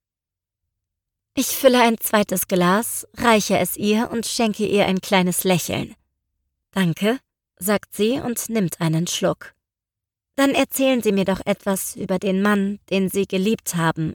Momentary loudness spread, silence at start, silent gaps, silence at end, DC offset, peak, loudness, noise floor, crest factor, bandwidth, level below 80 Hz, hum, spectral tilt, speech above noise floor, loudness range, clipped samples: 7 LU; 1.35 s; none; 0 s; under 0.1%; -4 dBFS; -20 LUFS; -88 dBFS; 18 dB; 19 kHz; -54 dBFS; none; -4.5 dB/octave; 68 dB; 5 LU; under 0.1%